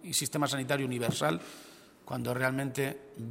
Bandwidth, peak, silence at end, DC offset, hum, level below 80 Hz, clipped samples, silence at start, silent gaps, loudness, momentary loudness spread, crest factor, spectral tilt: 16 kHz; -12 dBFS; 0 s; under 0.1%; none; -68 dBFS; under 0.1%; 0 s; none; -32 LUFS; 14 LU; 22 dB; -4 dB/octave